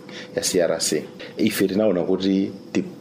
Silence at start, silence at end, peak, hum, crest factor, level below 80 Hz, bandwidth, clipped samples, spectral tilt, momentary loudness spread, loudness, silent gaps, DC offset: 0 s; 0 s; -8 dBFS; none; 14 dB; -62 dBFS; 15.5 kHz; under 0.1%; -4 dB/octave; 7 LU; -22 LUFS; none; under 0.1%